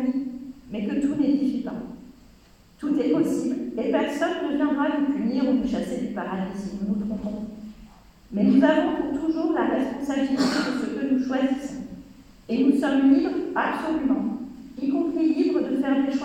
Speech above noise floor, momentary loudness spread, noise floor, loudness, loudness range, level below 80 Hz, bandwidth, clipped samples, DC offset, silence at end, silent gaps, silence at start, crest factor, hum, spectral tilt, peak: 30 dB; 14 LU; -53 dBFS; -24 LUFS; 3 LU; -54 dBFS; 10.5 kHz; under 0.1%; under 0.1%; 0 s; none; 0 s; 18 dB; none; -6.5 dB/octave; -6 dBFS